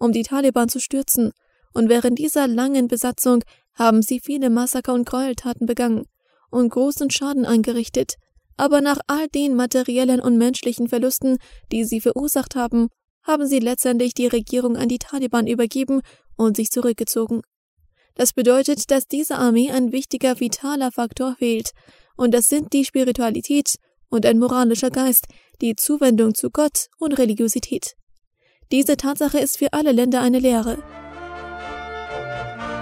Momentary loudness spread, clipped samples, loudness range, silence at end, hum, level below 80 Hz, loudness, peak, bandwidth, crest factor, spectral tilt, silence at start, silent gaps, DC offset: 10 LU; under 0.1%; 3 LU; 0 s; none; -50 dBFS; -20 LUFS; 0 dBFS; 16 kHz; 20 dB; -4 dB/octave; 0 s; 13.10-13.21 s, 17.47-17.77 s, 28.03-28.07 s, 28.27-28.31 s; under 0.1%